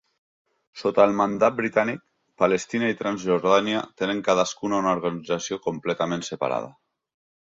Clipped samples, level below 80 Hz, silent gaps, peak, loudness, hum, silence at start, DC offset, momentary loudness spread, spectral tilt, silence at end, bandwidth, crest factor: under 0.1%; -64 dBFS; none; -4 dBFS; -24 LUFS; none; 0.75 s; under 0.1%; 8 LU; -4.5 dB/octave; 0.75 s; 7.8 kHz; 22 dB